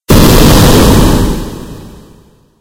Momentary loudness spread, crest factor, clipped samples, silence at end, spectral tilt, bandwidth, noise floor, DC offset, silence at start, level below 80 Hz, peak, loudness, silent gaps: 20 LU; 8 dB; 4%; 0.75 s; -5 dB/octave; over 20 kHz; -42 dBFS; under 0.1%; 0.1 s; -14 dBFS; 0 dBFS; -6 LUFS; none